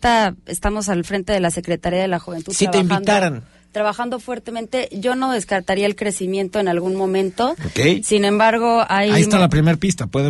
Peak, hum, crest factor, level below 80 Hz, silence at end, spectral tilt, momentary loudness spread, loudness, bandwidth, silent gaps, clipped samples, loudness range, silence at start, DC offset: -4 dBFS; none; 14 dB; -40 dBFS; 0 s; -5 dB/octave; 9 LU; -18 LUFS; 11.5 kHz; none; under 0.1%; 5 LU; 0 s; under 0.1%